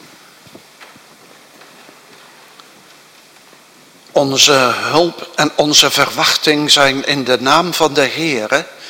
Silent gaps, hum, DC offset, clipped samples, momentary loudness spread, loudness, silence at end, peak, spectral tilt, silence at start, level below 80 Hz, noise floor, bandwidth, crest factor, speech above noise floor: none; none; under 0.1%; 0.2%; 8 LU; -12 LUFS; 0 s; 0 dBFS; -2 dB/octave; 0.8 s; -56 dBFS; -44 dBFS; over 20 kHz; 16 dB; 31 dB